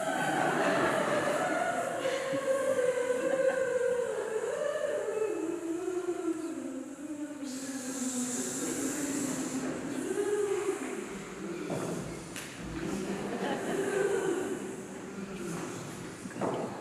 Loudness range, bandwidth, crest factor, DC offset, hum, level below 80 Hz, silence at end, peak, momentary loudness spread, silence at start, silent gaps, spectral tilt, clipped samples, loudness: 6 LU; 15 kHz; 18 dB; under 0.1%; none; -64 dBFS; 0 s; -16 dBFS; 11 LU; 0 s; none; -4 dB/octave; under 0.1%; -33 LUFS